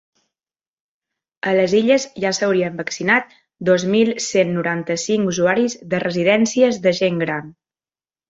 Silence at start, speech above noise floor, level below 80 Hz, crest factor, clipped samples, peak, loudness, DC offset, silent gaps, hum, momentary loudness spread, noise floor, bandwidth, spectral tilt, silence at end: 1.45 s; over 72 dB; -60 dBFS; 18 dB; under 0.1%; -2 dBFS; -18 LUFS; under 0.1%; none; none; 7 LU; under -90 dBFS; 8 kHz; -4.5 dB/octave; 0.8 s